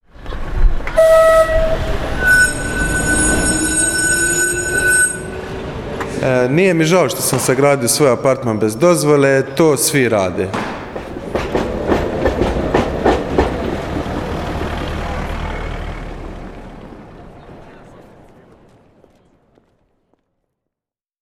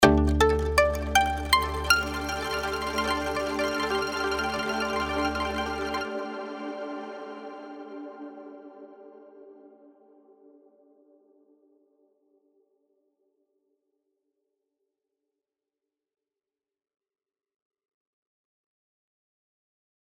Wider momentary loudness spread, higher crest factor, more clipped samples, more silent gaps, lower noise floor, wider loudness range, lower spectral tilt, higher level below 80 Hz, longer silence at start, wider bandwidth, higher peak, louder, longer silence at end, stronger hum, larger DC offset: second, 15 LU vs 19 LU; second, 16 dB vs 28 dB; neither; neither; about the same, -88 dBFS vs under -90 dBFS; second, 13 LU vs 20 LU; about the same, -4 dB/octave vs -4.5 dB/octave; first, -26 dBFS vs -40 dBFS; first, 0.2 s vs 0 s; first, 18 kHz vs 16 kHz; about the same, -2 dBFS vs -2 dBFS; first, -15 LUFS vs -26 LUFS; second, 3.2 s vs 10.4 s; neither; neither